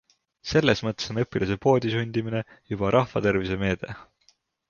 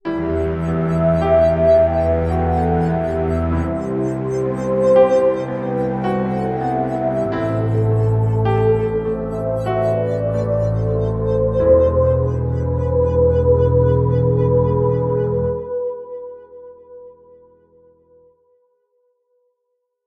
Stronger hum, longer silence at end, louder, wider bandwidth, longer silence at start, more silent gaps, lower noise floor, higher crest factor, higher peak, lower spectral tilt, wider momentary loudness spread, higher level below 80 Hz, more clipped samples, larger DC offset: neither; second, 0.65 s vs 2.95 s; second, -25 LUFS vs -18 LUFS; second, 7.2 kHz vs 8.8 kHz; first, 0.45 s vs 0.05 s; neither; second, -65 dBFS vs -73 dBFS; about the same, 20 dB vs 16 dB; about the same, -4 dBFS vs -2 dBFS; second, -6 dB/octave vs -9.5 dB/octave; first, 11 LU vs 8 LU; second, -48 dBFS vs -32 dBFS; neither; neither